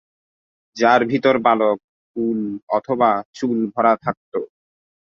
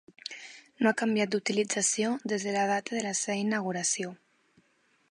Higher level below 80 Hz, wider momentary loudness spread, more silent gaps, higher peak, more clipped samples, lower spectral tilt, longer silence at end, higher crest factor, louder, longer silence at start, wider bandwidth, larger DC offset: first, -64 dBFS vs -80 dBFS; about the same, 13 LU vs 14 LU; first, 1.84-2.14 s, 2.63-2.67 s, 3.25-3.33 s, 4.17-4.32 s vs none; first, -2 dBFS vs -10 dBFS; neither; first, -6 dB/octave vs -3 dB/octave; second, 0.6 s vs 0.95 s; about the same, 18 dB vs 20 dB; first, -19 LUFS vs -29 LUFS; first, 0.75 s vs 0.25 s; second, 7.4 kHz vs 11.5 kHz; neither